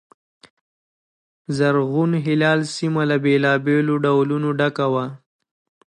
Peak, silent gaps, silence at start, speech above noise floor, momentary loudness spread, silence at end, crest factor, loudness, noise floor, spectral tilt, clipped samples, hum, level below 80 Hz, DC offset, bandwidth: -6 dBFS; none; 1.5 s; over 71 dB; 5 LU; 0.8 s; 16 dB; -19 LUFS; under -90 dBFS; -6.5 dB/octave; under 0.1%; none; -68 dBFS; under 0.1%; 11 kHz